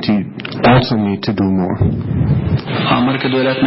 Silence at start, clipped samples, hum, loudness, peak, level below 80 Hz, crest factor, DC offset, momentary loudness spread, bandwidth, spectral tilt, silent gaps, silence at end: 0 s; under 0.1%; none; -15 LUFS; 0 dBFS; -32 dBFS; 14 dB; under 0.1%; 6 LU; 5.8 kHz; -11.5 dB/octave; none; 0 s